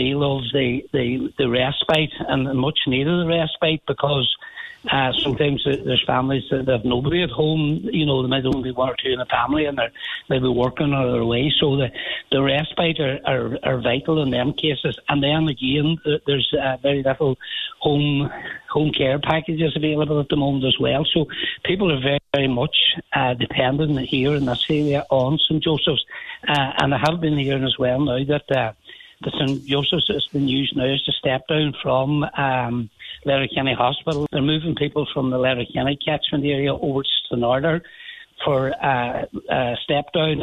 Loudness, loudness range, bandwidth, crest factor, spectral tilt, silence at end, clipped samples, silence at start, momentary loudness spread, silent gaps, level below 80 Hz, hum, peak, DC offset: -20 LUFS; 2 LU; 9.2 kHz; 18 dB; -7 dB/octave; 0 s; under 0.1%; 0 s; 5 LU; none; -46 dBFS; none; -2 dBFS; under 0.1%